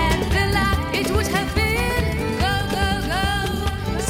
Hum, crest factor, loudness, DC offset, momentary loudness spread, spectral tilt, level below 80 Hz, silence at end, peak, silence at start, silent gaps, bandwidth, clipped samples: none; 14 dB; -21 LUFS; under 0.1%; 3 LU; -5 dB/octave; -28 dBFS; 0 s; -6 dBFS; 0 s; none; 17.5 kHz; under 0.1%